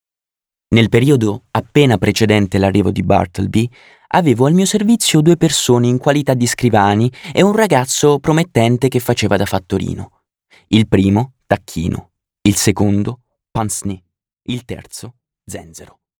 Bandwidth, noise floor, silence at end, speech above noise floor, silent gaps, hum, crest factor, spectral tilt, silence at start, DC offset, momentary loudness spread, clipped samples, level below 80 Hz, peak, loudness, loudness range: over 20 kHz; -89 dBFS; 0.35 s; 75 dB; none; none; 14 dB; -5.5 dB/octave; 0.7 s; under 0.1%; 14 LU; under 0.1%; -44 dBFS; 0 dBFS; -14 LUFS; 6 LU